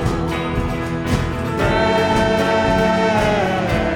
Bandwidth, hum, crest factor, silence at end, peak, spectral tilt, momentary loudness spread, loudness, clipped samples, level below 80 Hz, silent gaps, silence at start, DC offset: 18 kHz; none; 14 dB; 0 s; -4 dBFS; -6 dB/octave; 6 LU; -18 LUFS; under 0.1%; -30 dBFS; none; 0 s; under 0.1%